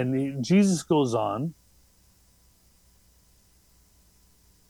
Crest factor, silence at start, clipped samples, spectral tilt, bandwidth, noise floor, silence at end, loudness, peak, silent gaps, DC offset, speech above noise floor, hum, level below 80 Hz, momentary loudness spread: 20 dB; 0 s; under 0.1%; -6.5 dB/octave; 13 kHz; -61 dBFS; 3.2 s; -25 LUFS; -10 dBFS; none; under 0.1%; 37 dB; 60 Hz at -60 dBFS; -64 dBFS; 10 LU